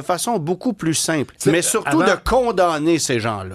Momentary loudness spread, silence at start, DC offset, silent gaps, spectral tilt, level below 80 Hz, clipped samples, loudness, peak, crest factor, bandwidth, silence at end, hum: 5 LU; 0 s; under 0.1%; none; -4 dB/octave; -40 dBFS; under 0.1%; -18 LUFS; -2 dBFS; 16 dB; 14.5 kHz; 0 s; none